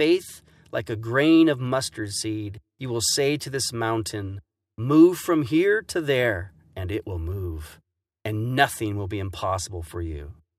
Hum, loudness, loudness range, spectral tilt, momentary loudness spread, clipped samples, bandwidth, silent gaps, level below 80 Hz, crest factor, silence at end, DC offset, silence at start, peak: none; -24 LUFS; 6 LU; -5 dB/octave; 18 LU; under 0.1%; 15 kHz; none; -46 dBFS; 22 dB; 0.25 s; under 0.1%; 0 s; -2 dBFS